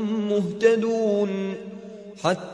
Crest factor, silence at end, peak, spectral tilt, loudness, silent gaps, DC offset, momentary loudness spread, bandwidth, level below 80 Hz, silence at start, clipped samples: 18 dB; 0 s; -6 dBFS; -6 dB/octave; -23 LUFS; none; under 0.1%; 18 LU; 10.5 kHz; -68 dBFS; 0 s; under 0.1%